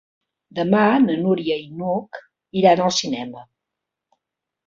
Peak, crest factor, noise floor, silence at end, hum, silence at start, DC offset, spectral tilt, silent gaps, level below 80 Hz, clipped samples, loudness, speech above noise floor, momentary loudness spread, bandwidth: -2 dBFS; 20 dB; -83 dBFS; 1.25 s; none; 0.55 s; under 0.1%; -5 dB/octave; none; -62 dBFS; under 0.1%; -19 LUFS; 64 dB; 17 LU; 7.6 kHz